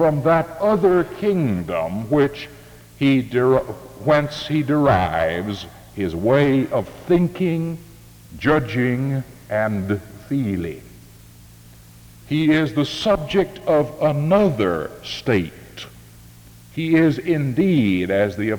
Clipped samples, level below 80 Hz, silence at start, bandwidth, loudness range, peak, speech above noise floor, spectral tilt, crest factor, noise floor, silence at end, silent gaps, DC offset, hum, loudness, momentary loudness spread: under 0.1%; -46 dBFS; 0 s; over 20 kHz; 4 LU; -4 dBFS; 26 dB; -7.5 dB/octave; 16 dB; -45 dBFS; 0 s; none; under 0.1%; none; -20 LUFS; 12 LU